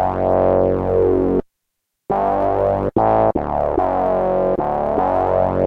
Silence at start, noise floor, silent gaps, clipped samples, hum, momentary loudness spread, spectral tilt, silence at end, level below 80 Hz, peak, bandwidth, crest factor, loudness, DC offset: 0 s; -76 dBFS; none; under 0.1%; none; 4 LU; -10 dB/octave; 0 s; -36 dBFS; -4 dBFS; 5.4 kHz; 14 dB; -18 LUFS; under 0.1%